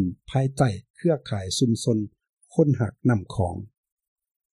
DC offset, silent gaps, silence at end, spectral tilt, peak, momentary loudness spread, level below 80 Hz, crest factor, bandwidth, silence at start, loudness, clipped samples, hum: under 0.1%; 0.90-0.94 s, 2.29-2.37 s; 0.85 s; -6.5 dB/octave; -8 dBFS; 7 LU; -52 dBFS; 18 dB; 12.5 kHz; 0 s; -25 LUFS; under 0.1%; none